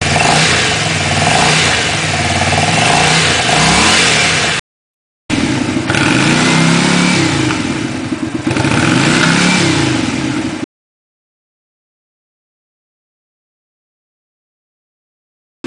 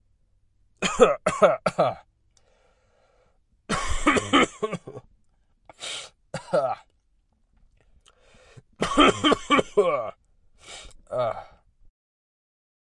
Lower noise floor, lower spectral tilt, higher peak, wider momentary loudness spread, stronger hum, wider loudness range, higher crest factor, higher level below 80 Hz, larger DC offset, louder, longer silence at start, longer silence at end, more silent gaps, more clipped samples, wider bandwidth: first, under -90 dBFS vs -66 dBFS; about the same, -3.5 dB/octave vs -4 dB/octave; about the same, 0 dBFS vs -2 dBFS; second, 9 LU vs 20 LU; neither; second, 7 LU vs 10 LU; second, 14 dB vs 24 dB; first, -36 dBFS vs -44 dBFS; neither; first, -11 LUFS vs -23 LUFS; second, 0 s vs 0.8 s; first, 5 s vs 1.45 s; first, 4.59-5.29 s vs none; neither; about the same, 10.5 kHz vs 11.5 kHz